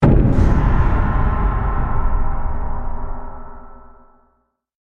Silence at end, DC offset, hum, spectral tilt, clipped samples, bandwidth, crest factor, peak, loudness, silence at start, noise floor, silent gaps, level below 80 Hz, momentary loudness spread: 1.15 s; under 0.1%; none; -9.5 dB/octave; under 0.1%; 4.1 kHz; 16 dB; 0 dBFS; -20 LUFS; 0 s; -64 dBFS; none; -20 dBFS; 18 LU